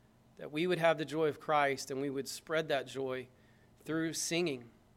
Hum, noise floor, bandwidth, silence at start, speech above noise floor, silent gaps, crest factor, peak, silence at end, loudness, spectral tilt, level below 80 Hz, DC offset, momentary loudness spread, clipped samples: none; -63 dBFS; 16.5 kHz; 0.4 s; 29 dB; none; 22 dB; -14 dBFS; 0.25 s; -35 LUFS; -4 dB/octave; -74 dBFS; under 0.1%; 12 LU; under 0.1%